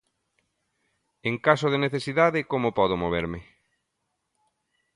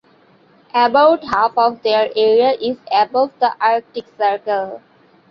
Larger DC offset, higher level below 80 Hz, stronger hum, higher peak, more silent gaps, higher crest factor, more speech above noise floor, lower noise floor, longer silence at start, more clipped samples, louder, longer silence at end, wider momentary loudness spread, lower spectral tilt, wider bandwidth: neither; first, -54 dBFS vs -60 dBFS; neither; about the same, -4 dBFS vs -2 dBFS; neither; first, 24 dB vs 14 dB; first, 55 dB vs 36 dB; first, -79 dBFS vs -52 dBFS; first, 1.25 s vs 0.75 s; neither; second, -25 LUFS vs -16 LUFS; first, 1.55 s vs 0.55 s; about the same, 10 LU vs 9 LU; about the same, -6.5 dB/octave vs -5.5 dB/octave; first, 11.5 kHz vs 6.6 kHz